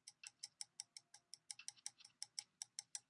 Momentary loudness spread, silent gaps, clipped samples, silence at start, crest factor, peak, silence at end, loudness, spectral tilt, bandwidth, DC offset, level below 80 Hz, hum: 8 LU; none; under 0.1%; 0.05 s; 30 dB; -28 dBFS; 0.1 s; -54 LUFS; 3.5 dB/octave; 12 kHz; under 0.1%; under -90 dBFS; none